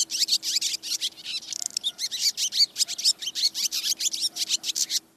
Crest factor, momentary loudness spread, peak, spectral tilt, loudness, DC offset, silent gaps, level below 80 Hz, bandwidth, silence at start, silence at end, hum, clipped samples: 22 dB; 7 LU; -6 dBFS; 3.5 dB/octave; -24 LUFS; under 0.1%; none; -78 dBFS; 14.5 kHz; 0 s; 0.2 s; none; under 0.1%